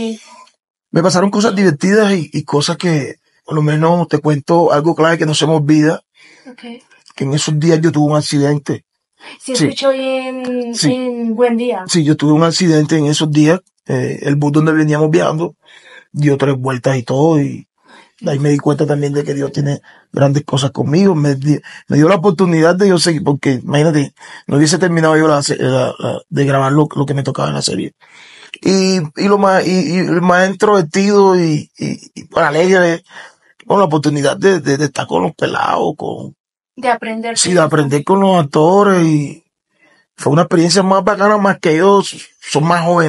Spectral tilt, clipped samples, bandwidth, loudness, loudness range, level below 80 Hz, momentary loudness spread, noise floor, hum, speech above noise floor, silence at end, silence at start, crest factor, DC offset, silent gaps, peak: -5.5 dB/octave; under 0.1%; 12 kHz; -13 LUFS; 4 LU; -60 dBFS; 10 LU; -55 dBFS; none; 43 dB; 0 s; 0 s; 14 dB; under 0.1%; 0.70-0.74 s, 36.40-36.44 s; 0 dBFS